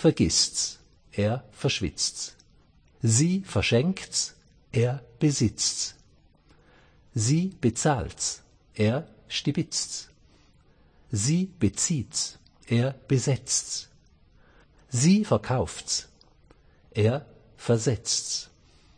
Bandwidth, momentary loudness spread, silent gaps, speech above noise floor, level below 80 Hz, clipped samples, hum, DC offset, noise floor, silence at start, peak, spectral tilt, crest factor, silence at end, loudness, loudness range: 9.8 kHz; 11 LU; none; 33 dB; -52 dBFS; under 0.1%; none; under 0.1%; -59 dBFS; 0 s; -8 dBFS; -4.5 dB/octave; 18 dB; 0.5 s; -26 LUFS; 3 LU